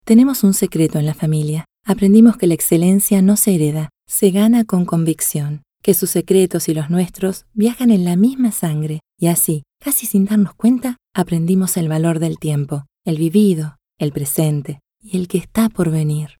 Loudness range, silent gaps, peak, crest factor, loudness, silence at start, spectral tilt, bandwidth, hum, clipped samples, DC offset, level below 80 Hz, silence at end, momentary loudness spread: 5 LU; none; 0 dBFS; 16 dB; -16 LUFS; 0.05 s; -6 dB/octave; over 20 kHz; none; under 0.1%; under 0.1%; -50 dBFS; 0.15 s; 11 LU